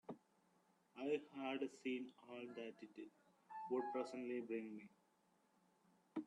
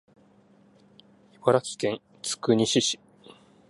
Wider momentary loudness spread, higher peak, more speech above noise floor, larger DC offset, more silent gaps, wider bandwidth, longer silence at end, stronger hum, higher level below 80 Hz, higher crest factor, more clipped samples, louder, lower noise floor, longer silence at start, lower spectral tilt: first, 14 LU vs 11 LU; second, -32 dBFS vs -6 dBFS; about the same, 32 dB vs 34 dB; neither; neither; about the same, 11 kHz vs 11.5 kHz; second, 0 s vs 0.75 s; neither; second, under -90 dBFS vs -68 dBFS; about the same, 18 dB vs 22 dB; neither; second, -48 LUFS vs -26 LUFS; first, -79 dBFS vs -58 dBFS; second, 0.1 s vs 1.45 s; first, -5.5 dB/octave vs -4 dB/octave